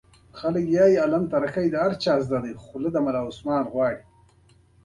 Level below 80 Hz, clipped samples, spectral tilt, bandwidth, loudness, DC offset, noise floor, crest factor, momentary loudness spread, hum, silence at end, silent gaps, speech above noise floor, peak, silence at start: -56 dBFS; under 0.1%; -7 dB/octave; 11 kHz; -24 LUFS; under 0.1%; -57 dBFS; 16 dB; 11 LU; none; 0.85 s; none; 35 dB; -8 dBFS; 0.35 s